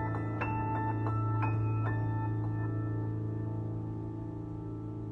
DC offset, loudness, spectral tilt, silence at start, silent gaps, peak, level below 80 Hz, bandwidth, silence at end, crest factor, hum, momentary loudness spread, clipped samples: under 0.1%; -35 LUFS; -10.5 dB/octave; 0 s; none; -18 dBFS; -52 dBFS; 3.8 kHz; 0 s; 16 dB; none; 9 LU; under 0.1%